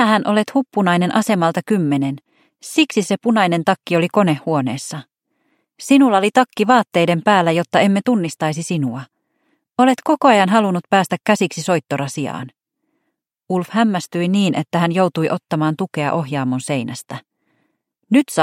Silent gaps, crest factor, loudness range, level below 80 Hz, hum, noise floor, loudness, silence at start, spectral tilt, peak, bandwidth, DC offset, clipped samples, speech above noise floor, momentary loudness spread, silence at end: none; 18 dB; 5 LU; -66 dBFS; none; -74 dBFS; -17 LUFS; 0 s; -5.5 dB/octave; 0 dBFS; 16 kHz; under 0.1%; under 0.1%; 58 dB; 11 LU; 0 s